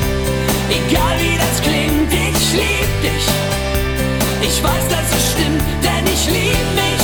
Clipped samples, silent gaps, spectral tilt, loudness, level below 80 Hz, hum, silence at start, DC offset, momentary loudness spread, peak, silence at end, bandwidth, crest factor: under 0.1%; none; -4 dB/octave; -15 LUFS; -24 dBFS; none; 0 s; under 0.1%; 3 LU; -4 dBFS; 0 s; over 20 kHz; 12 dB